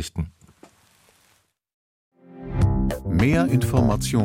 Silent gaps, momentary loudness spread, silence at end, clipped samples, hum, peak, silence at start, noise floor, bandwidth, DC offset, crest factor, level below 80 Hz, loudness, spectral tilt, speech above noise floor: 1.74-2.11 s; 13 LU; 0 s; under 0.1%; none; -6 dBFS; 0 s; -64 dBFS; 16.5 kHz; under 0.1%; 18 dB; -34 dBFS; -22 LUFS; -6.5 dB/octave; 43 dB